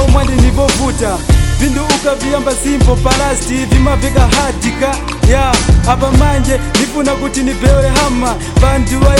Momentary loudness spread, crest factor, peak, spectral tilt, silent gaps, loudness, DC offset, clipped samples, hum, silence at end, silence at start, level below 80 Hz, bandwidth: 4 LU; 10 dB; 0 dBFS; -5 dB/octave; none; -12 LUFS; under 0.1%; 0.1%; none; 0 s; 0 s; -14 dBFS; 16 kHz